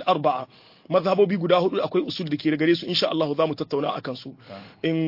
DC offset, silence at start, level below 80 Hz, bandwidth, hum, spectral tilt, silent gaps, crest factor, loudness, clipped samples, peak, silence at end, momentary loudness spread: under 0.1%; 0 s; -68 dBFS; 5.8 kHz; none; -7 dB/octave; none; 18 dB; -23 LUFS; under 0.1%; -6 dBFS; 0 s; 15 LU